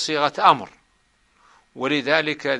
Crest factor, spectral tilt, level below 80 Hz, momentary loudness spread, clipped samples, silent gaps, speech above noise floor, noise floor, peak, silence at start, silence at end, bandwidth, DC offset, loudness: 22 dB; -3.5 dB/octave; -66 dBFS; 10 LU; under 0.1%; none; 43 dB; -63 dBFS; 0 dBFS; 0 s; 0 s; 11.5 kHz; under 0.1%; -20 LUFS